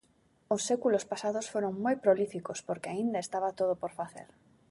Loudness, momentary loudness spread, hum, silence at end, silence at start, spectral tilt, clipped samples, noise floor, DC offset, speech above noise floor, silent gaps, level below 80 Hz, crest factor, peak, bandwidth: -32 LUFS; 11 LU; none; 0.45 s; 0.5 s; -4.5 dB/octave; under 0.1%; -68 dBFS; under 0.1%; 37 dB; none; -74 dBFS; 20 dB; -12 dBFS; 11.5 kHz